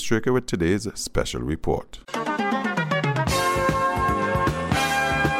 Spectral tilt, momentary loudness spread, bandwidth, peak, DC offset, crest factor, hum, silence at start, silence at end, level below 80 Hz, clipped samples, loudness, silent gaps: -5 dB/octave; 6 LU; 16.5 kHz; -6 dBFS; under 0.1%; 16 dB; none; 0 s; 0 s; -38 dBFS; under 0.1%; -23 LUFS; none